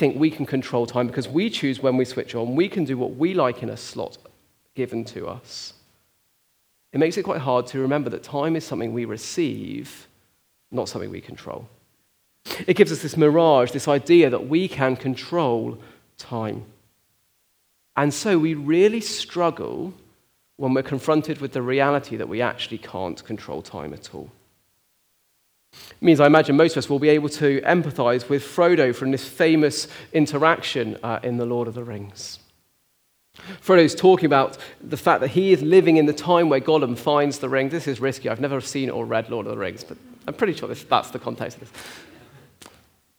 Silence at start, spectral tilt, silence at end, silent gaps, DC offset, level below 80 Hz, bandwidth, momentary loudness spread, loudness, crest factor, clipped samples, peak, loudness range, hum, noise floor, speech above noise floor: 0 s; -6 dB/octave; 1.15 s; none; under 0.1%; -66 dBFS; over 20 kHz; 18 LU; -21 LUFS; 22 dB; under 0.1%; 0 dBFS; 10 LU; none; -66 dBFS; 45 dB